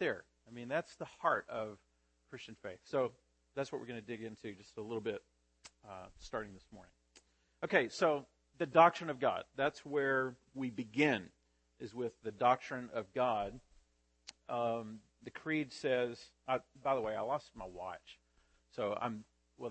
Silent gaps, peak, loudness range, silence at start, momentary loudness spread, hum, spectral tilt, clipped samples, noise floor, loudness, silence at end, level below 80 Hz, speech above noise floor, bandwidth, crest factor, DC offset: none; -12 dBFS; 11 LU; 0 s; 19 LU; none; -5.5 dB/octave; under 0.1%; -73 dBFS; -37 LUFS; 0 s; -70 dBFS; 36 dB; 8.4 kHz; 26 dB; under 0.1%